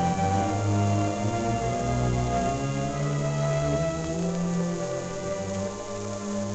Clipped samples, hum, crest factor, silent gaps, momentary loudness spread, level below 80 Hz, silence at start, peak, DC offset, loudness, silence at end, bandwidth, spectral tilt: under 0.1%; none; 14 dB; none; 6 LU; -42 dBFS; 0 s; -12 dBFS; under 0.1%; -27 LUFS; 0 s; 9.2 kHz; -6 dB/octave